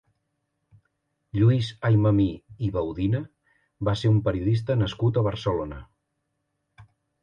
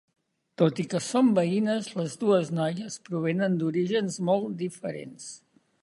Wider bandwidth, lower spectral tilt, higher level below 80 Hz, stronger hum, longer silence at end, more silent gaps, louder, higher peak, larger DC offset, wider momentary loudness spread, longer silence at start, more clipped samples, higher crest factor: second, 7.2 kHz vs 11.5 kHz; first, -8.5 dB/octave vs -6 dB/octave; first, -46 dBFS vs -74 dBFS; neither; about the same, 0.4 s vs 0.45 s; neither; about the same, -25 LUFS vs -27 LUFS; about the same, -10 dBFS vs -8 dBFS; neither; second, 10 LU vs 13 LU; first, 1.35 s vs 0.6 s; neither; about the same, 16 dB vs 18 dB